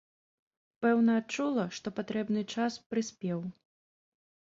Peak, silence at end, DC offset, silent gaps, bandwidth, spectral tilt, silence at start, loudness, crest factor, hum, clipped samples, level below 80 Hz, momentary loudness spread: -16 dBFS; 1.1 s; under 0.1%; 2.86-2.90 s; 7.8 kHz; -5.5 dB/octave; 0.8 s; -32 LUFS; 18 dB; none; under 0.1%; -74 dBFS; 10 LU